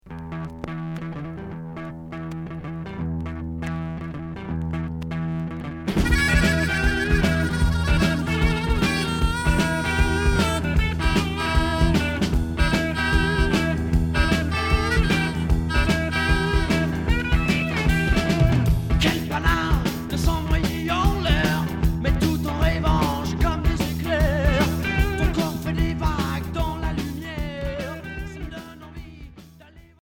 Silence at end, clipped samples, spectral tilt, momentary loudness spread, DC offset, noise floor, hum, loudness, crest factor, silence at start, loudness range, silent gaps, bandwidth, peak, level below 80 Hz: 0.25 s; under 0.1%; -5.5 dB/octave; 12 LU; under 0.1%; -48 dBFS; none; -23 LUFS; 18 dB; 0.05 s; 9 LU; none; 18 kHz; -4 dBFS; -26 dBFS